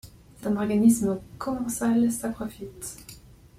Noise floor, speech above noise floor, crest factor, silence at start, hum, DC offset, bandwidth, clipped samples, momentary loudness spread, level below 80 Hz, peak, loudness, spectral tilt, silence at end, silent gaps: -48 dBFS; 23 dB; 18 dB; 0.05 s; none; under 0.1%; 15.5 kHz; under 0.1%; 17 LU; -54 dBFS; -8 dBFS; -25 LUFS; -6 dB/octave; 0.4 s; none